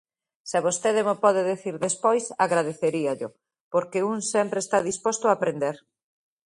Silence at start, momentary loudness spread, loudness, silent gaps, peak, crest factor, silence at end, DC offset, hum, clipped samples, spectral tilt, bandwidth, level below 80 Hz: 0.45 s; 8 LU; -25 LUFS; 3.61-3.71 s; -6 dBFS; 20 dB; 0.7 s; under 0.1%; none; under 0.1%; -4 dB/octave; 11.5 kHz; -72 dBFS